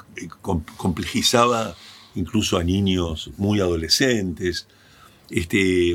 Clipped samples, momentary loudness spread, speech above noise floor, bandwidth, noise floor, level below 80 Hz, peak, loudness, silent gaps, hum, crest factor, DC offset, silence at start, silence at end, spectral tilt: under 0.1%; 14 LU; 29 dB; 17 kHz; -50 dBFS; -42 dBFS; 0 dBFS; -21 LUFS; none; none; 22 dB; under 0.1%; 0.15 s; 0 s; -4.5 dB/octave